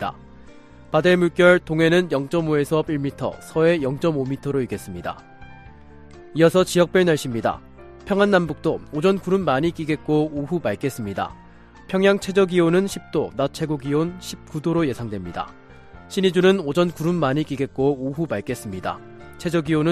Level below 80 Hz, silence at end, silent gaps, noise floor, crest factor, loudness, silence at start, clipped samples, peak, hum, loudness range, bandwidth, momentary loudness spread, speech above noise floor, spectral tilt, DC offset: -50 dBFS; 0 s; none; -44 dBFS; 18 dB; -21 LUFS; 0 s; under 0.1%; -2 dBFS; none; 4 LU; 14.5 kHz; 12 LU; 23 dB; -6 dB/octave; under 0.1%